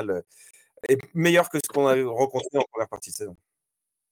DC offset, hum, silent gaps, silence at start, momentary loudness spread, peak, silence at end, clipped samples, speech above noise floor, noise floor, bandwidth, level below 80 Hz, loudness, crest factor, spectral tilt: under 0.1%; none; none; 0 s; 14 LU; -8 dBFS; 0.75 s; under 0.1%; 59 dB; -84 dBFS; 19 kHz; -68 dBFS; -24 LUFS; 18 dB; -4.5 dB/octave